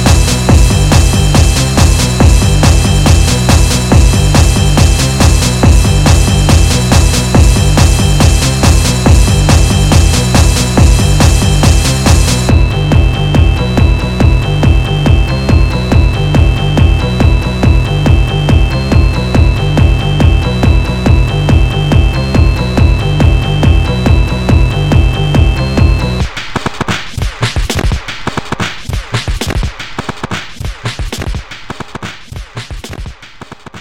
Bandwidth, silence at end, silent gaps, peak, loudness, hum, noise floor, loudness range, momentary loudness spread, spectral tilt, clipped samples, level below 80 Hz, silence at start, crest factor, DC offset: 16 kHz; 0 s; none; 0 dBFS; -10 LUFS; none; -32 dBFS; 9 LU; 11 LU; -5 dB/octave; 0.6%; -12 dBFS; 0 s; 8 dB; under 0.1%